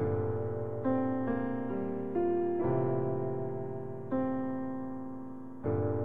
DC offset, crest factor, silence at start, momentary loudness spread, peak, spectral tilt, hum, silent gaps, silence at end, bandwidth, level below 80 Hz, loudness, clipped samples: 0.6%; 14 dB; 0 s; 9 LU; -20 dBFS; -11.5 dB/octave; none; none; 0 s; 3.7 kHz; -60 dBFS; -34 LUFS; under 0.1%